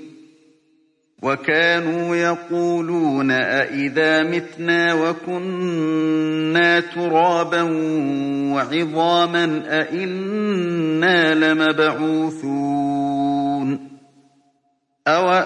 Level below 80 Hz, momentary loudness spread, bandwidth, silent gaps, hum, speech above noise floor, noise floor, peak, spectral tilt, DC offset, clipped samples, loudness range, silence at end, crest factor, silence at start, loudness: -70 dBFS; 7 LU; 9.6 kHz; none; none; 48 dB; -67 dBFS; -4 dBFS; -5.5 dB/octave; under 0.1%; under 0.1%; 2 LU; 0 s; 16 dB; 0 s; -19 LUFS